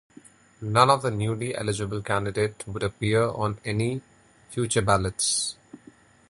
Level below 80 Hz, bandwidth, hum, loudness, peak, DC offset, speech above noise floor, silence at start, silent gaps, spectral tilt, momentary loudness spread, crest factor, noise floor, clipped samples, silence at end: -50 dBFS; 11.5 kHz; none; -25 LUFS; -4 dBFS; under 0.1%; 29 dB; 0.6 s; none; -4.5 dB/octave; 10 LU; 24 dB; -54 dBFS; under 0.1%; 0.55 s